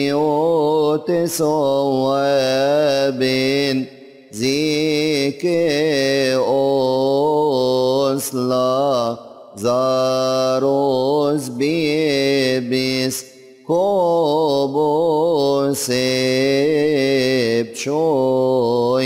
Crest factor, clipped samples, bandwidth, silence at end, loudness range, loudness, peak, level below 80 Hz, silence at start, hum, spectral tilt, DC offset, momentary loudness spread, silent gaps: 10 dB; under 0.1%; 16 kHz; 0 s; 1 LU; -17 LUFS; -8 dBFS; -60 dBFS; 0 s; none; -5 dB/octave; under 0.1%; 4 LU; none